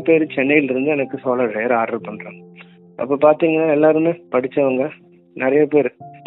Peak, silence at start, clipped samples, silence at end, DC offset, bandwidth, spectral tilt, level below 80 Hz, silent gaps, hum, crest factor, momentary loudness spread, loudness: 0 dBFS; 0 s; under 0.1%; 0.1 s; under 0.1%; 4.1 kHz; -11 dB/octave; -66 dBFS; none; none; 18 dB; 12 LU; -17 LUFS